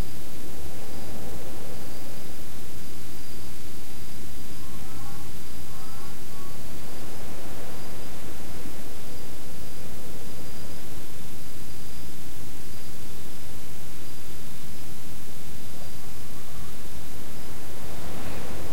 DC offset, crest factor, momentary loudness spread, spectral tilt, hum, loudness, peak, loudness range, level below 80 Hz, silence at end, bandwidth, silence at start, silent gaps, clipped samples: 20%; 18 dB; 2 LU; -4.5 dB/octave; none; -40 LUFS; -12 dBFS; 1 LU; -48 dBFS; 0 s; 16.5 kHz; 0 s; none; under 0.1%